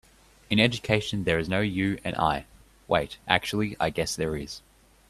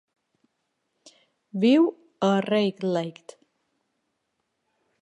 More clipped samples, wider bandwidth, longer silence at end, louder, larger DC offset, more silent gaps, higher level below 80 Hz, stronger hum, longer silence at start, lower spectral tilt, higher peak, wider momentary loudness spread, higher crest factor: neither; first, 14.5 kHz vs 10.5 kHz; second, 0.5 s vs 1.9 s; second, -26 LUFS vs -23 LUFS; neither; neither; first, -50 dBFS vs -78 dBFS; neither; second, 0.5 s vs 1.55 s; second, -5 dB/octave vs -6.5 dB/octave; first, -2 dBFS vs -10 dBFS; second, 8 LU vs 11 LU; first, 26 dB vs 18 dB